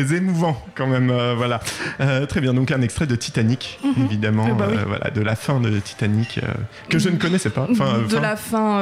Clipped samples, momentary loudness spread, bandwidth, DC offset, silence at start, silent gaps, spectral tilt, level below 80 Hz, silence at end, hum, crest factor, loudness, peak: under 0.1%; 4 LU; 15.5 kHz; under 0.1%; 0 s; none; -6 dB/octave; -48 dBFS; 0 s; none; 12 dB; -21 LUFS; -8 dBFS